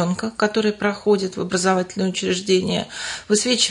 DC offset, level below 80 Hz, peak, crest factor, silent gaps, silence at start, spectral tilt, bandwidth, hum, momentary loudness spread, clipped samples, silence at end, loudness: under 0.1%; -58 dBFS; -4 dBFS; 16 dB; none; 0 s; -3.5 dB/octave; 11 kHz; none; 5 LU; under 0.1%; 0 s; -21 LUFS